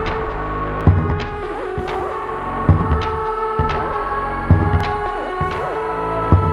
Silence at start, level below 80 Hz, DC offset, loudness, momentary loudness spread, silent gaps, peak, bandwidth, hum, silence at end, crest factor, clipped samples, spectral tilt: 0 s; -28 dBFS; under 0.1%; -20 LUFS; 8 LU; none; 0 dBFS; 9.8 kHz; none; 0 s; 18 dB; under 0.1%; -8.5 dB/octave